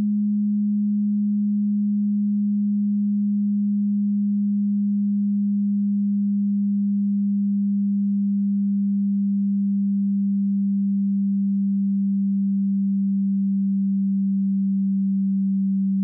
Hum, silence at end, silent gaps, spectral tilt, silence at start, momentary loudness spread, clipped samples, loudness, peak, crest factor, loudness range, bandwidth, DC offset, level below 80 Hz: none; 0 s; none; -28 dB/octave; 0 s; 0 LU; under 0.1%; -22 LUFS; -18 dBFS; 4 dB; 0 LU; 0.3 kHz; under 0.1%; -80 dBFS